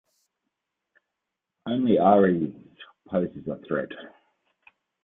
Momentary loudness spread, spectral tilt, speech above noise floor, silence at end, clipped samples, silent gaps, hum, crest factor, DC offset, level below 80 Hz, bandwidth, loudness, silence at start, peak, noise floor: 19 LU; -10 dB/octave; 61 dB; 0.95 s; under 0.1%; none; none; 22 dB; under 0.1%; -66 dBFS; 4 kHz; -24 LUFS; 1.65 s; -6 dBFS; -84 dBFS